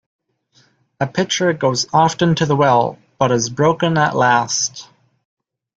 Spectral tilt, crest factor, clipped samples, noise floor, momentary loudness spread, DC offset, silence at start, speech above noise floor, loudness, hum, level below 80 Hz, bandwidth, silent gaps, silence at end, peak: -4.5 dB/octave; 16 dB; under 0.1%; -57 dBFS; 9 LU; under 0.1%; 1 s; 41 dB; -16 LUFS; none; -54 dBFS; 9 kHz; none; 0.9 s; -2 dBFS